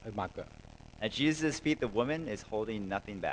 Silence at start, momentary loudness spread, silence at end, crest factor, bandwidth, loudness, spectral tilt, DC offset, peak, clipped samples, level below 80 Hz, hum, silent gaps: 0 s; 17 LU; 0 s; 20 dB; 9.8 kHz; -34 LUFS; -5 dB/octave; under 0.1%; -16 dBFS; under 0.1%; -56 dBFS; none; none